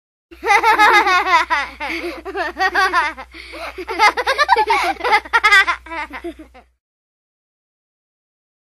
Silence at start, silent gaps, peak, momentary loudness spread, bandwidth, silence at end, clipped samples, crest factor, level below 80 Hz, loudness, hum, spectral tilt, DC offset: 0.4 s; none; 0 dBFS; 18 LU; 19.5 kHz; 2.15 s; under 0.1%; 18 dB; -46 dBFS; -15 LUFS; none; -1.5 dB/octave; under 0.1%